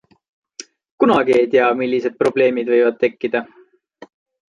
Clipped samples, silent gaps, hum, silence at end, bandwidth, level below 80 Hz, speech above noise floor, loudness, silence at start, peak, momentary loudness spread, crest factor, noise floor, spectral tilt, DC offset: under 0.1%; 0.91-0.98 s; none; 1.1 s; 11 kHz; -62 dBFS; 29 dB; -17 LUFS; 0.6 s; -2 dBFS; 22 LU; 16 dB; -45 dBFS; -5.5 dB/octave; under 0.1%